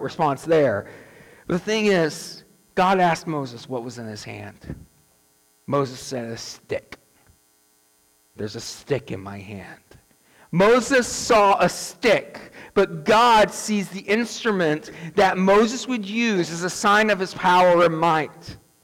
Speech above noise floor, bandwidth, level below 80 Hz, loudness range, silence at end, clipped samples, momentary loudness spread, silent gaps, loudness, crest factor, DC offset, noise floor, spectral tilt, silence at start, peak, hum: 40 dB; 18 kHz; -54 dBFS; 14 LU; 0.3 s; under 0.1%; 19 LU; none; -21 LUFS; 12 dB; under 0.1%; -61 dBFS; -4.5 dB/octave; 0 s; -10 dBFS; none